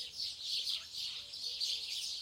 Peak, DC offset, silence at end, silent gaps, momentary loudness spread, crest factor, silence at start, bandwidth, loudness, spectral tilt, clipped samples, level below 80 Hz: -22 dBFS; under 0.1%; 0 s; none; 5 LU; 18 dB; 0 s; 16.5 kHz; -37 LUFS; 2 dB/octave; under 0.1%; -76 dBFS